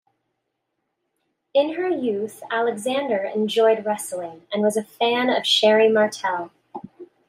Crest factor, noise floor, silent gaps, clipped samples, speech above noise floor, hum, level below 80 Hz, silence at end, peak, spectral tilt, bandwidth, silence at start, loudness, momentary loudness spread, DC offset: 16 dB; -77 dBFS; none; under 0.1%; 56 dB; none; -76 dBFS; 0.25 s; -6 dBFS; -3.5 dB/octave; 15.5 kHz; 1.55 s; -21 LUFS; 14 LU; under 0.1%